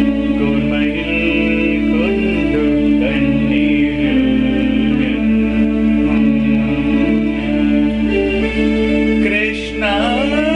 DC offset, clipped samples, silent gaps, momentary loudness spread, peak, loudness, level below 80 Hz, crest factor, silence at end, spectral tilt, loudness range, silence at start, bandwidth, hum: under 0.1%; under 0.1%; none; 2 LU; -4 dBFS; -15 LUFS; -28 dBFS; 10 dB; 0 s; -7 dB/octave; 1 LU; 0 s; 9.4 kHz; none